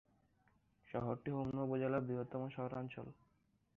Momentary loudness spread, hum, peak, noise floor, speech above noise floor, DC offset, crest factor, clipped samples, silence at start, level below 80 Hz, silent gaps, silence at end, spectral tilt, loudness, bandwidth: 10 LU; none; -26 dBFS; -76 dBFS; 34 dB; under 0.1%; 18 dB; under 0.1%; 0.85 s; -72 dBFS; none; 0.65 s; -8 dB/octave; -42 LUFS; 4.9 kHz